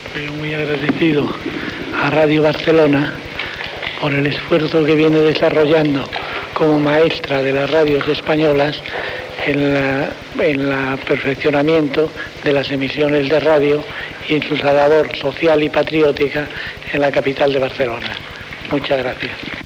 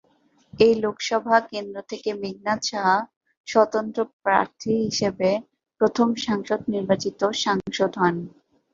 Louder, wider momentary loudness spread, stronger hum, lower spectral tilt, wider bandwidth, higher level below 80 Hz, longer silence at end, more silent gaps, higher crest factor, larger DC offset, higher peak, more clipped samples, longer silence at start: first, -16 LUFS vs -23 LUFS; about the same, 10 LU vs 10 LU; neither; first, -6.5 dB/octave vs -4.5 dB/octave; first, 16 kHz vs 7.6 kHz; first, -46 dBFS vs -60 dBFS; second, 0 s vs 0.45 s; second, none vs 3.16-3.21 s, 3.37-3.44 s, 4.13-4.20 s; second, 14 dB vs 22 dB; neither; about the same, -2 dBFS vs -2 dBFS; neither; second, 0 s vs 0.55 s